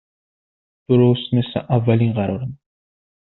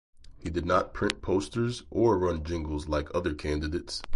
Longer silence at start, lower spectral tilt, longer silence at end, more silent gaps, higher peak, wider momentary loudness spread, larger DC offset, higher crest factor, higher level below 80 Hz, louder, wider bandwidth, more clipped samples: first, 0.9 s vs 0.2 s; first, -7.5 dB/octave vs -6 dB/octave; first, 0.8 s vs 0 s; neither; first, -4 dBFS vs -8 dBFS; about the same, 10 LU vs 8 LU; neither; about the same, 18 dB vs 22 dB; second, -54 dBFS vs -40 dBFS; first, -18 LUFS vs -29 LUFS; second, 4.1 kHz vs 11.5 kHz; neither